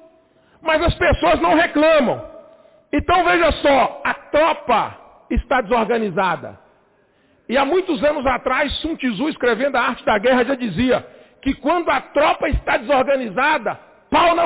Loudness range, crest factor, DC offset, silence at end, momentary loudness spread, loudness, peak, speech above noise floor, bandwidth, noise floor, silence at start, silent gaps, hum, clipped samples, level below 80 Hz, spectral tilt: 4 LU; 12 dB; under 0.1%; 0 s; 9 LU; -18 LUFS; -6 dBFS; 40 dB; 4 kHz; -58 dBFS; 0.65 s; none; none; under 0.1%; -34 dBFS; -9 dB/octave